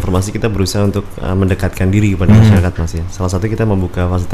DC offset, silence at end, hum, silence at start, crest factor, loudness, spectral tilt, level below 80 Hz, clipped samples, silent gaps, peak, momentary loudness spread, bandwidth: 3%; 0 s; none; 0 s; 12 dB; -14 LUFS; -7 dB/octave; -26 dBFS; 0.2%; none; 0 dBFS; 11 LU; 14 kHz